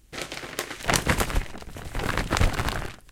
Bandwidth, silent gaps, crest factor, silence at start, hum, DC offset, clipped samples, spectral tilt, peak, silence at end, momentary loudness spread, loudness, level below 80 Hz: 17 kHz; none; 26 dB; 0.1 s; none; under 0.1%; under 0.1%; -3.5 dB/octave; -2 dBFS; 0 s; 12 LU; -27 LUFS; -32 dBFS